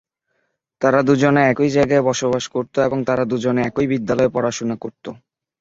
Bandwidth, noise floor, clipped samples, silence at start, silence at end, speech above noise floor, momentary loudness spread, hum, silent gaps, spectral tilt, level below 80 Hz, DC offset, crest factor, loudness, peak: 7.8 kHz; -70 dBFS; under 0.1%; 0.8 s; 0.45 s; 53 dB; 10 LU; none; none; -6 dB/octave; -52 dBFS; under 0.1%; 18 dB; -18 LUFS; -2 dBFS